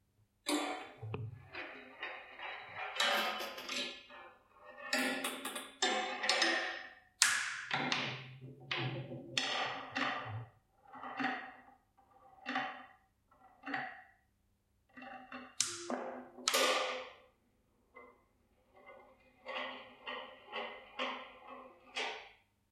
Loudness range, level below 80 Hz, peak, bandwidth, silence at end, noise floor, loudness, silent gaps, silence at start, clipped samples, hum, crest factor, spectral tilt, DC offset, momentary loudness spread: 12 LU; -80 dBFS; -4 dBFS; 16 kHz; 0.4 s; -76 dBFS; -37 LUFS; none; 0.45 s; under 0.1%; none; 38 dB; -2 dB/octave; under 0.1%; 21 LU